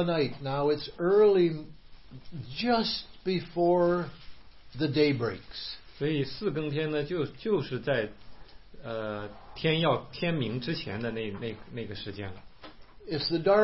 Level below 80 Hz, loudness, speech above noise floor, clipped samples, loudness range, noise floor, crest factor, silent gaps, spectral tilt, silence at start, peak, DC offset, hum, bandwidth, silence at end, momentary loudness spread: -54 dBFS; -29 LUFS; 20 dB; under 0.1%; 5 LU; -49 dBFS; 18 dB; none; -10 dB/octave; 0 s; -12 dBFS; 0.3%; none; 5.8 kHz; 0 s; 15 LU